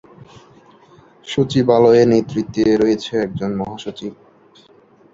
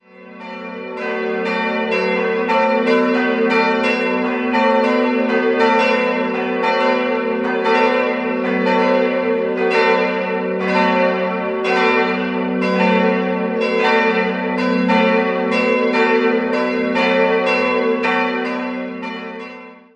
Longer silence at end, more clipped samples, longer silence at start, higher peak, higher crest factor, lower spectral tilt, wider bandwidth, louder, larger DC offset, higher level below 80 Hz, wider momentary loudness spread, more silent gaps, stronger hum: first, 1 s vs 0.15 s; neither; first, 1.25 s vs 0.2 s; about the same, -2 dBFS vs -2 dBFS; about the same, 16 dB vs 16 dB; about the same, -7 dB/octave vs -6 dB/octave; second, 7.8 kHz vs 8.6 kHz; about the same, -16 LUFS vs -17 LUFS; neither; first, -52 dBFS vs -60 dBFS; first, 18 LU vs 7 LU; neither; neither